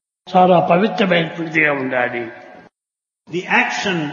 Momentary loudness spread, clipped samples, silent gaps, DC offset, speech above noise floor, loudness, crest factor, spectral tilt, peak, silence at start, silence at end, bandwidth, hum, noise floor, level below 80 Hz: 14 LU; under 0.1%; none; under 0.1%; 70 dB; -16 LUFS; 16 dB; -5.5 dB/octave; -2 dBFS; 0.25 s; 0 s; 7.4 kHz; none; -86 dBFS; -66 dBFS